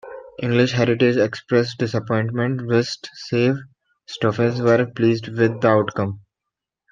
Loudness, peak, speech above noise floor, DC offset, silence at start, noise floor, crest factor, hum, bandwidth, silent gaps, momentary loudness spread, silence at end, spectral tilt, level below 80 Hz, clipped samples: -20 LUFS; -2 dBFS; 65 dB; under 0.1%; 0.05 s; -84 dBFS; 18 dB; none; 7.4 kHz; none; 10 LU; 0.75 s; -7 dB/octave; -60 dBFS; under 0.1%